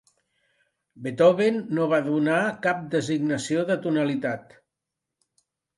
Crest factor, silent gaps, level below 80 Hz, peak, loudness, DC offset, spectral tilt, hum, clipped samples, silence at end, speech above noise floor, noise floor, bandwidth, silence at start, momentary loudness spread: 20 dB; none; -70 dBFS; -6 dBFS; -24 LUFS; under 0.1%; -6 dB/octave; none; under 0.1%; 1.35 s; 62 dB; -85 dBFS; 11.5 kHz; 0.95 s; 10 LU